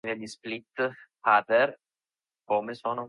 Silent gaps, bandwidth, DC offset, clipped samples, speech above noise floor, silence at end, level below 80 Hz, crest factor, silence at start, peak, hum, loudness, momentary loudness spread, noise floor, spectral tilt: none; 11.5 kHz; under 0.1%; under 0.1%; over 63 dB; 0 s; -78 dBFS; 20 dB; 0.05 s; -10 dBFS; none; -28 LUFS; 14 LU; under -90 dBFS; -4.5 dB/octave